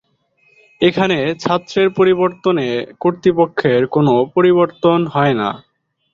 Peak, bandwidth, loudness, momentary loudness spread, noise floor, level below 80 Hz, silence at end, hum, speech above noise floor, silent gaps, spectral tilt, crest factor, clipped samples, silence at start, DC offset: -2 dBFS; 7.2 kHz; -15 LUFS; 6 LU; -59 dBFS; -54 dBFS; 0.55 s; none; 44 dB; none; -7 dB/octave; 14 dB; under 0.1%; 0.8 s; under 0.1%